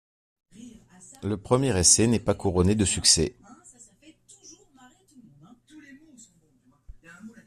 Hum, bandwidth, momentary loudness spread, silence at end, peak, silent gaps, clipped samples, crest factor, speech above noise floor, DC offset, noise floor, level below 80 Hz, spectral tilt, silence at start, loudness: none; 14 kHz; 15 LU; 0.15 s; -4 dBFS; none; under 0.1%; 24 dB; 40 dB; under 0.1%; -63 dBFS; -50 dBFS; -3.5 dB/octave; 0.6 s; -22 LUFS